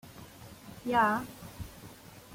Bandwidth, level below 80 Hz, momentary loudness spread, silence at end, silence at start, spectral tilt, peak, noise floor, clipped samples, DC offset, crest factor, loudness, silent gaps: 16.5 kHz; -58 dBFS; 23 LU; 0 s; 0.05 s; -5 dB/octave; -16 dBFS; -51 dBFS; under 0.1%; under 0.1%; 20 dB; -30 LUFS; none